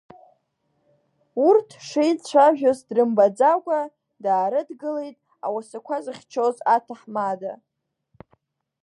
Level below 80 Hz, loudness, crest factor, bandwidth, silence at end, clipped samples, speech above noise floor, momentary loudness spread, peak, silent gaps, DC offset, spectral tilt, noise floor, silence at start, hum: -76 dBFS; -22 LUFS; 18 dB; 11.5 kHz; 1.3 s; under 0.1%; 51 dB; 14 LU; -6 dBFS; none; under 0.1%; -5.5 dB/octave; -72 dBFS; 1.35 s; none